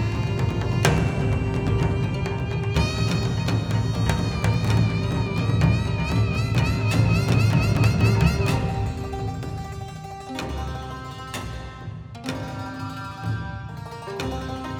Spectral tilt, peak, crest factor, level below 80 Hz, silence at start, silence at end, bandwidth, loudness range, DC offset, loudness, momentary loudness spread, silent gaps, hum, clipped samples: -6.5 dB/octave; 0 dBFS; 24 dB; -34 dBFS; 0 s; 0 s; 16 kHz; 11 LU; under 0.1%; -24 LUFS; 14 LU; none; none; under 0.1%